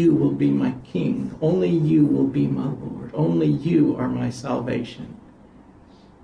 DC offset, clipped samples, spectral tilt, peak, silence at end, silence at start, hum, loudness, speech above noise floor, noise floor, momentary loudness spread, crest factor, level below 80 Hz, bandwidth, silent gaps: under 0.1%; under 0.1%; -9 dB/octave; -8 dBFS; 1.05 s; 0 s; none; -22 LUFS; 28 dB; -49 dBFS; 10 LU; 14 dB; -52 dBFS; 10 kHz; none